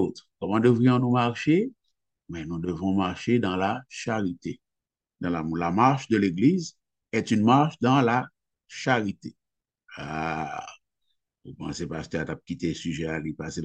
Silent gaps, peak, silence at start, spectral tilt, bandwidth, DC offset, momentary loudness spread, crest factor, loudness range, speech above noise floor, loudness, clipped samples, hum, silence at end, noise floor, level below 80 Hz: none; -6 dBFS; 0 s; -6.5 dB/octave; 8.8 kHz; under 0.1%; 17 LU; 20 dB; 10 LU; 63 dB; -26 LUFS; under 0.1%; none; 0 s; -88 dBFS; -56 dBFS